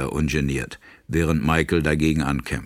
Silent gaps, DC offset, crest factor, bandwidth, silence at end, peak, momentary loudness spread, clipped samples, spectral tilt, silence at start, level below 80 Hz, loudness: none; under 0.1%; 18 dB; 16 kHz; 0 s; -4 dBFS; 8 LU; under 0.1%; -6 dB/octave; 0 s; -34 dBFS; -22 LUFS